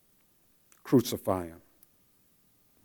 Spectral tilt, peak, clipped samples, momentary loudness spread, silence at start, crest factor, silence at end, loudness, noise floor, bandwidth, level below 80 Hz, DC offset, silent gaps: -6 dB/octave; -12 dBFS; under 0.1%; 19 LU; 0.85 s; 20 dB; 1.3 s; -29 LUFS; -66 dBFS; 19.5 kHz; -70 dBFS; under 0.1%; none